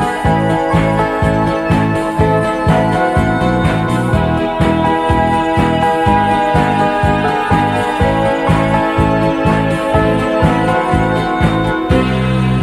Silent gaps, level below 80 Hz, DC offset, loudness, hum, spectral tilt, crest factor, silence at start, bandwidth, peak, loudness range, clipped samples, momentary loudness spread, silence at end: none; -26 dBFS; under 0.1%; -13 LUFS; none; -7 dB/octave; 12 dB; 0 s; 13 kHz; 0 dBFS; 1 LU; under 0.1%; 2 LU; 0 s